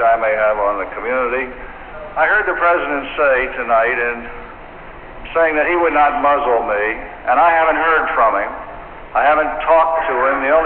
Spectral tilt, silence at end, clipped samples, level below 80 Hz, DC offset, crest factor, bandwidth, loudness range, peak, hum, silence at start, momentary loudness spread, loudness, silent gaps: -1.5 dB/octave; 0 s; under 0.1%; -40 dBFS; under 0.1%; 14 dB; 4.3 kHz; 3 LU; -2 dBFS; none; 0 s; 19 LU; -15 LUFS; none